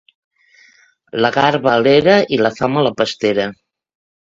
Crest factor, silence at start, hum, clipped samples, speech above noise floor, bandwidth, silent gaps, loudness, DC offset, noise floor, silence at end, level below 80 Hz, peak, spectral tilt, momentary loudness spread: 16 dB; 1.15 s; none; under 0.1%; 38 dB; 7.8 kHz; none; -15 LUFS; under 0.1%; -52 dBFS; 0.8 s; -54 dBFS; 0 dBFS; -5.5 dB/octave; 8 LU